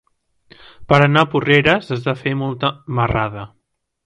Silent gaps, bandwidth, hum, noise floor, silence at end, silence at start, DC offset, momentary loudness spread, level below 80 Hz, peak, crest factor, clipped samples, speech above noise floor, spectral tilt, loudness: none; 8.8 kHz; none; -52 dBFS; 0.6 s; 0.8 s; under 0.1%; 10 LU; -42 dBFS; 0 dBFS; 18 dB; under 0.1%; 35 dB; -7 dB/octave; -17 LUFS